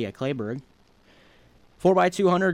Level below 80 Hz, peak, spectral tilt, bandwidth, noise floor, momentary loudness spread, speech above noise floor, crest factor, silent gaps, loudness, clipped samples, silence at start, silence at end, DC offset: -60 dBFS; -10 dBFS; -6.5 dB/octave; 13.5 kHz; -57 dBFS; 13 LU; 35 dB; 16 dB; none; -23 LUFS; under 0.1%; 0 s; 0 s; under 0.1%